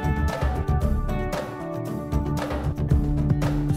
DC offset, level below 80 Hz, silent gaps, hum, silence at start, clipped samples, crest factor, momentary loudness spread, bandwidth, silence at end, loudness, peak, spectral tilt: under 0.1%; -28 dBFS; none; none; 0 s; under 0.1%; 16 dB; 7 LU; 15.5 kHz; 0 s; -26 LUFS; -8 dBFS; -7.5 dB/octave